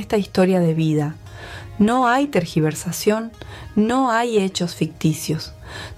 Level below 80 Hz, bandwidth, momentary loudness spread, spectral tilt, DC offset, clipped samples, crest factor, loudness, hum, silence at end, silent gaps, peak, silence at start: -46 dBFS; 15.5 kHz; 17 LU; -6 dB/octave; under 0.1%; under 0.1%; 16 dB; -20 LUFS; none; 0 s; none; -4 dBFS; 0 s